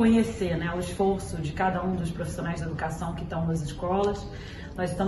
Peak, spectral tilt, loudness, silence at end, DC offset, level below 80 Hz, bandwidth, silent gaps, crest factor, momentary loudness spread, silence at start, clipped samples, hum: -12 dBFS; -6.5 dB/octave; -29 LUFS; 0 s; under 0.1%; -42 dBFS; 12.5 kHz; none; 16 dB; 7 LU; 0 s; under 0.1%; none